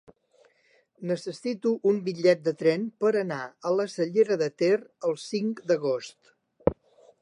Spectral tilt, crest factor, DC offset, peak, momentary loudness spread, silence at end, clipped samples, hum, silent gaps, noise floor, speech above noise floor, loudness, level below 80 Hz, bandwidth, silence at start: -6 dB/octave; 22 dB; under 0.1%; -6 dBFS; 9 LU; 0.5 s; under 0.1%; none; none; -65 dBFS; 39 dB; -27 LUFS; -56 dBFS; 11 kHz; 1 s